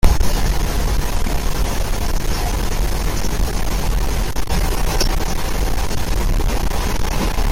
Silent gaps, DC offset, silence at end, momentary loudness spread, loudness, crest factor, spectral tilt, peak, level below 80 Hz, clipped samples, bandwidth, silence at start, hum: none; under 0.1%; 0 s; 3 LU; -22 LUFS; 16 dB; -4.5 dB/octave; 0 dBFS; -18 dBFS; under 0.1%; 17 kHz; 0.05 s; none